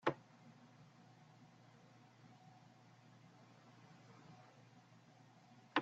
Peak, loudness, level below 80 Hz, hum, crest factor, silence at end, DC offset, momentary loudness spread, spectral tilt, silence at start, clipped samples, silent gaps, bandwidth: -20 dBFS; -57 LUFS; -90 dBFS; none; 32 dB; 0 s; under 0.1%; 5 LU; -3 dB/octave; 0 s; under 0.1%; none; 8 kHz